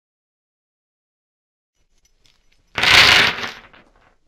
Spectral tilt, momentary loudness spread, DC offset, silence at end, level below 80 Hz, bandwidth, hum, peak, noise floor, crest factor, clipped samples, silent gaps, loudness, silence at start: -1 dB/octave; 21 LU; under 0.1%; 0.75 s; -46 dBFS; 17 kHz; none; 0 dBFS; -60 dBFS; 20 dB; under 0.1%; none; -11 LUFS; 2.75 s